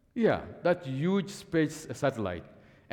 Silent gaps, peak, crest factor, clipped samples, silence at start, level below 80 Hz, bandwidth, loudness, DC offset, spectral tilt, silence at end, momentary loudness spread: none; -14 dBFS; 16 dB; under 0.1%; 0.15 s; -62 dBFS; 17.5 kHz; -30 LUFS; under 0.1%; -6.5 dB/octave; 0.4 s; 7 LU